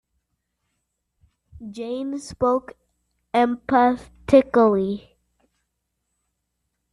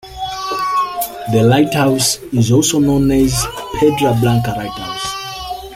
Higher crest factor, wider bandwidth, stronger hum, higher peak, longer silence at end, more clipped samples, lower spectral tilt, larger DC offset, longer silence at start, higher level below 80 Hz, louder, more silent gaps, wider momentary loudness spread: first, 22 dB vs 14 dB; second, 11.5 kHz vs 16.5 kHz; neither; about the same, -2 dBFS vs -2 dBFS; first, 1.95 s vs 0 s; neither; first, -6.5 dB/octave vs -5 dB/octave; neither; first, 1.55 s vs 0.05 s; second, -54 dBFS vs -36 dBFS; second, -21 LUFS vs -15 LUFS; neither; first, 16 LU vs 11 LU